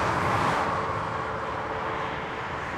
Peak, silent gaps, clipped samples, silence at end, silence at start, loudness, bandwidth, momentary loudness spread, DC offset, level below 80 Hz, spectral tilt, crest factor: -12 dBFS; none; under 0.1%; 0 s; 0 s; -28 LUFS; 16 kHz; 7 LU; under 0.1%; -50 dBFS; -5.5 dB/octave; 16 dB